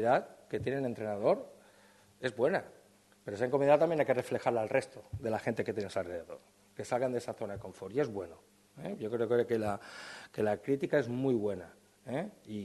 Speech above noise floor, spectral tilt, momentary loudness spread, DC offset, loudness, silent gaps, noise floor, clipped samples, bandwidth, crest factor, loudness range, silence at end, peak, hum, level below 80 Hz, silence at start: 29 dB; -6.5 dB/octave; 16 LU; under 0.1%; -34 LUFS; none; -62 dBFS; under 0.1%; 12.5 kHz; 22 dB; 6 LU; 0 s; -12 dBFS; none; -70 dBFS; 0 s